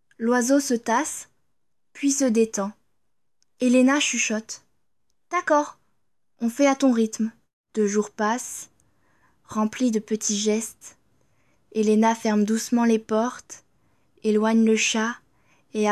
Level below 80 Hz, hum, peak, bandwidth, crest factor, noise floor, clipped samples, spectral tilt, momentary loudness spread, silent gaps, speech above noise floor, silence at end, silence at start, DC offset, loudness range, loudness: -72 dBFS; none; -8 dBFS; 13 kHz; 16 dB; -81 dBFS; under 0.1%; -3.5 dB/octave; 14 LU; 7.53-7.64 s; 59 dB; 0 s; 0.2 s; under 0.1%; 4 LU; -23 LUFS